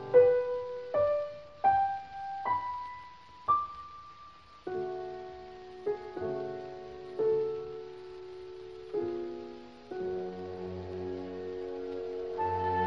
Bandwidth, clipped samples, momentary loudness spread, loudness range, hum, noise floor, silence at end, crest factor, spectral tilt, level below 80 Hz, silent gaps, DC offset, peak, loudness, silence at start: 6.4 kHz; under 0.1%; 17 LU; 8 LU; none; -53 dBFS; 0 s; 22 dB; -7.5 dB/octave; -66 dBFS; none; under 0.1%; -12 dBFS; -34 LUFS; 0 s